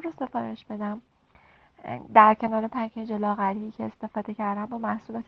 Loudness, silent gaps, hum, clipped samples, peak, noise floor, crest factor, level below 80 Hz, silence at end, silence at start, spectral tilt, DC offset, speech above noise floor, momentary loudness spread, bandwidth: -26 LUFS; none; none; under 0.1%; -4 dBFS; -59 dBFS; 24 dB; -66 dBFS; 0.05 s; 0 s; -8.5 dB/octave; under 0.1%; 33 dB; 17 LU; 5.6 kHz